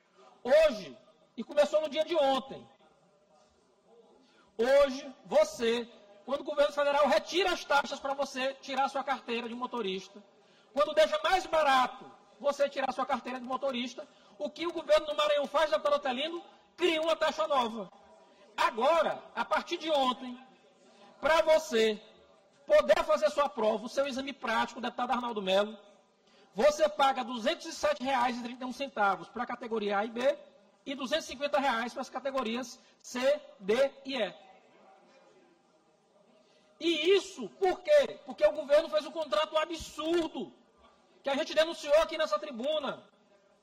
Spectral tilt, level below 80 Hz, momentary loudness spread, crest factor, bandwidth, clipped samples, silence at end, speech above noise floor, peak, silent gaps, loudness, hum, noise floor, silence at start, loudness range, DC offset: -3 dB/octave; -62 dBFS; 14 LU; 18 dB; 15 kHz; under 0.1%; 0.65 s; 37 dB; -14 dBFS; none; -30 LUFS; none; -67 dBFS; 0.45 s; 5 LU; under 0.1%